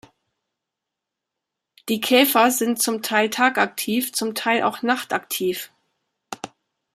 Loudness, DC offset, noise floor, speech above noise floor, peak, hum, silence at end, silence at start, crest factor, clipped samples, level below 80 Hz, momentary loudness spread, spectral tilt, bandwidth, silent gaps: -20 LUFS; under 0.1%; -84 dBFS; 63 dB; -2 dBFS; none; 0.45 s; 1.85 s; 20 dB; under 0.1%; -72 dBFS; 19 LU; -2.5 dB/octave; 15.5 kHz; none